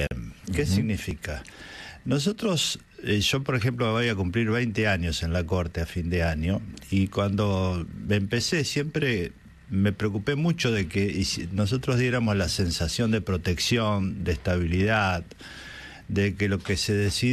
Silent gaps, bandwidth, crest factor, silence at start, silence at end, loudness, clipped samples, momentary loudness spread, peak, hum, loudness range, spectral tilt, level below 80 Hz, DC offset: none; 13.5 kHz; 16 dB; 0 s; 0 s; -26 LUFS; under 0.1%; 9 LU; -10 dBFS; none; 2 LU; -5 dB/octave; -44 dBFS; under 0.1%